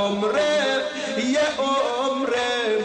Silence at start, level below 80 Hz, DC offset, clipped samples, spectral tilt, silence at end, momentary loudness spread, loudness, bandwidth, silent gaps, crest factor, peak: 0 s; -60 dBFS; under 0.1%; under 0.1%; -3 dB/octave; 0 s; 4 LU; -22 LUFS; 10 kHz; none; 10 dB; -12 dBFS